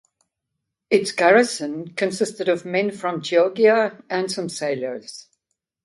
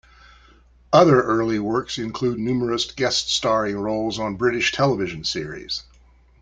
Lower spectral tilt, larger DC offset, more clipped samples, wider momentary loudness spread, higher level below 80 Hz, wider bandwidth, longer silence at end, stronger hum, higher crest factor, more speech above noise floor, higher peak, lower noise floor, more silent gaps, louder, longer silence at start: about the same, -4 dB/octave vs -4.5 dB/octave; neither; neither; about the same, 12 LU vs 12 LU; second, -70 dBFS vs -50 dBFS; first, 11.5 kHz vs 9.4 kHz; about the same, 0.65 s vs 0.6 s; neither; about the same, 18 dB vs 22 dB; first, 60 dB vs 32 dB; second, -4 dBFS vs 0 dBFS; first, -80 dBFS vs -53 dBFS; neither; about the same, -21 LUFS vs -21 LUFS; about the same, 0.9 s vs 0.9 s